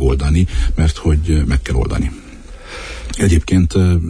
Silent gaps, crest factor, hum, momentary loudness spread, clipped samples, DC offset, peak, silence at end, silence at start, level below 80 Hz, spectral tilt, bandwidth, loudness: none; 12 dB; none; 16 LU; under 0.1%; under 0.1%; -2 dBFS; 0 s; 0 s; -18 dBFS; -6.5 dB/octave; 10.5 kHz; -16 LUFS